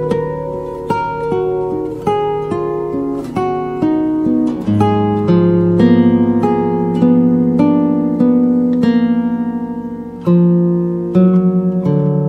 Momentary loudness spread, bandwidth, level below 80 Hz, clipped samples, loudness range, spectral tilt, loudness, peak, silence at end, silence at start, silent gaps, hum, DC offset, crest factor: 9 LU; 6 kHz; -44 dBFS; under 0.1%; 6 LU; -10 dB/octave; -14 LUFS; 0 dBFS; 0 s; 0 s; none; none; under 0.1%; 14 dB